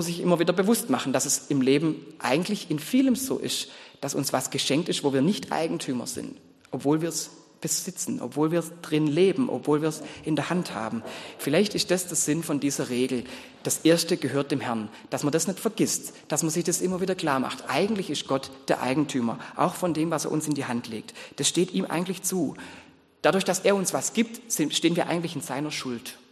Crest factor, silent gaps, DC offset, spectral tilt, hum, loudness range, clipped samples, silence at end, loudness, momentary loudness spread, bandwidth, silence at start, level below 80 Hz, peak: 22 dB; none; under 0.1%; -4 dB/octave; none; 2 LU; under 0.1%; 0.15 s; -26 LUFS; 9 LU; 13 kHz; 0 s; -68 dBFS; -4 dBFS